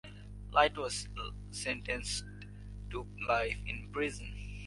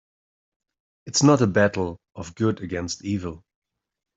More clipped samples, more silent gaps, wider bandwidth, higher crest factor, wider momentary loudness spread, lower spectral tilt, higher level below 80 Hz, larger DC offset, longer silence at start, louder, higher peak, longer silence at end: neither; neither; first, 11.5 kHz vs 8.2 kHz; about the same, 24 dB vs 22 dB; first, 20 LU vs 16 LU; second, -3.5 dB/octave vs -5 dB/octave; first, -48 dBFS vs -58 dBFS; neither; second, 0.05 s vs 1.05 s; second, -35 LUFS vs -23 LUFS; second, -12 dBFS vs -4 dBFS; second, 0 s vs 0.8 s